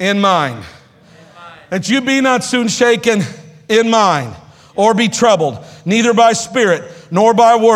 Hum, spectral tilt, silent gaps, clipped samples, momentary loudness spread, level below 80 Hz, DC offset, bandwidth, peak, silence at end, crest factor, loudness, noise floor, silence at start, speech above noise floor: none; -4 dB/octave; none; under 0.1%; 11 LU; -56 dBFS; under 0.1%; 15 kHz; 0 dBFS; 0 s; 14 dB; -13 LUFS; -43 dBFS; 0 s; 31 dB